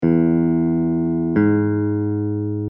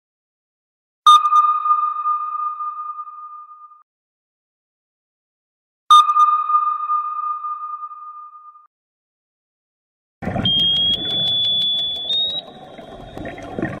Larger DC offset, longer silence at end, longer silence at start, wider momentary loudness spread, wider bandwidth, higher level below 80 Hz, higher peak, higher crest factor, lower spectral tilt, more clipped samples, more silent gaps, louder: neither; about the same, 0 s vs 0 s; second, 0 s vs 1.05 s; second, 5 LU vs 22 LU; second, 3.1 kHz vs 14 kHz; first, -46 dBFS vs -52 dBFS; about the same, -6 dBFS vs -4 dBFS; second, 12 dB vs 18 dB; first, -13.5 dB/octave vs -3 dB/octave; neither; second, none vs 3.83-5.87 s, 8.67-10.21 s; second, -19 LUFS vs -16 LUFS